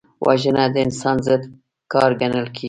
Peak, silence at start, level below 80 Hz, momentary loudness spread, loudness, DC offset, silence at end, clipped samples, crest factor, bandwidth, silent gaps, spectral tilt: -2 dBFS; 0.2 s; -52 dBFS; 5 LU; -19 LUFS; under 0.1%; 0 s; under 0.1%; 18 dB; 11 kHz; none; -6 dB/octave